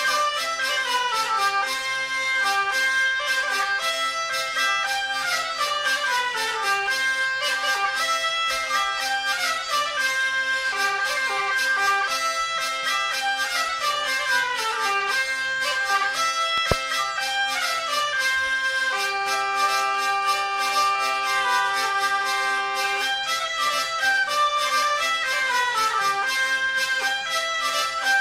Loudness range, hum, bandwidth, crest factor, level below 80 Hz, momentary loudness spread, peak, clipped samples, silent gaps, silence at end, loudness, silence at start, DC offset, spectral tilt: 1 LU; none; 16 kHz; 20 dB; -54 dBFS; 3 LU; -4 dBFS; under 0.1%; none; 0 s; -22 LUFS; 0 s; under 0.1%; 0.5 dB/octave